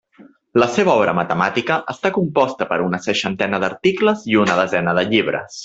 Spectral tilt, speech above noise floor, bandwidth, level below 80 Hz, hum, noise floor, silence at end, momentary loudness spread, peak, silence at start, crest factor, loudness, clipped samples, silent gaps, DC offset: -5.5 dB/octave; 30 dB; 8 kHz; -56 dBFS; none; -48 dBFS; 0 s; 5 LU; -2 dBFS; 0.2 s; 18 dB; -18 LUFS; under 0.1%; none; under 0.1%